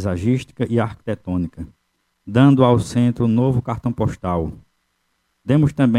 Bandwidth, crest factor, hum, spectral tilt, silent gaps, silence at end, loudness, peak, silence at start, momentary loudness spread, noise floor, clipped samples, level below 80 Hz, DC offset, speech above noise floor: 11.5 kHz; 16 dB; none; -8 dB/octave; none; 0 s; -19 LUFS; -2 dBFS; 0 s; 14 LU; -69 dBFS; under 0.1%; -42 dBFS; under 0.1%; 51 dB